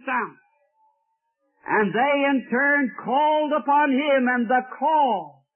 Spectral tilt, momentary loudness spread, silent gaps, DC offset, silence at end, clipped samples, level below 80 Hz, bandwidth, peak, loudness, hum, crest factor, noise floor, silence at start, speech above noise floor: -9.5 dB/octave; 7 LU; none; under 0.1%; 0.25 s; under 0.1%; -76 dBFS; 3.4 kHz; -8 dBFS; -21 LUFS; none; 14 dB; -73 dBFS; 0.05 s; 52 dB